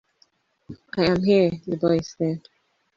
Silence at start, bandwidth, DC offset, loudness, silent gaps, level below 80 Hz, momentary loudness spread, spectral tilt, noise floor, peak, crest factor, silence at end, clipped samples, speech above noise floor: 0.7 s; 7.6 kHz; under 0.1%; -22 LUFS; none; -54 dBFS; 10 LU; -7 dB/octave; -64 dBFS; -6 dBFS; 18 dB; 0.6 s; under 0.1%; 43 dB